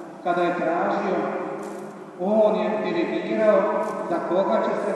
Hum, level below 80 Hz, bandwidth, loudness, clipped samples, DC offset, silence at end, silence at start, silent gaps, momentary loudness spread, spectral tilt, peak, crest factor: none; -76 dBFS; 11.5 kHz; -23 LUFS; under 0.1%; under 0.1%; 0 s; 0 s; none; 11 LU; -7 dB/octave; -6 dBFS; 18 dB